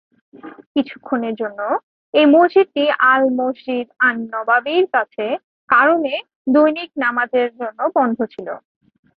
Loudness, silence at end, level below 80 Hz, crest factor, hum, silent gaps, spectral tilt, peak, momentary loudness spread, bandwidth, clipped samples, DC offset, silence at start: -17 LUFS; 0.6 s; -68 dBFS; 16 dB; none; 0.66-0.75 s, 1.83-2.13 s, 5.44-5.68 s, 6.35-6.45 s; -8 dB/octave; -2 dBFS; 11 LU; 5 kHz; under 0.1%; under 0.1%; 0.45 s